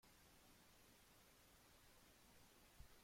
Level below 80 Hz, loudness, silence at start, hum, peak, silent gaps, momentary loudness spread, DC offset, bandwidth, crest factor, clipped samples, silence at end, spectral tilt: -76 dBFS; -70 LUFS; 0 s; none; -48 dBFS; none; 1 LU; under 0.1%; 16.5 kHz; 22 dB; under 0.1%; 0 s; -3 dB/octave